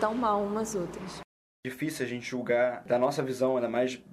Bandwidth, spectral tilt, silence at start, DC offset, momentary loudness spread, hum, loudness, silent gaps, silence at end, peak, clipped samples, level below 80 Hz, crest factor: 14.5 kHz; -5 dB/octave; 0 s; under 0.1%; 14 LU; none; -30 LUFS; 1.24-1.63 s; 0 s; -14 dBFS; under 0.1%; -62 dBFS; 16 dB